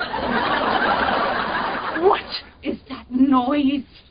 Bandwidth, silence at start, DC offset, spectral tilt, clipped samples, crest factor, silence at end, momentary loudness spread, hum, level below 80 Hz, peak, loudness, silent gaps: 5.2 kHz; 0 s; under 0.1%; -9.5 dB/octave; under 0.1%; 18 dB; 0.15 s; 12 LU; none; -46 dBFS; -4 dBFS; -21 LUFS; none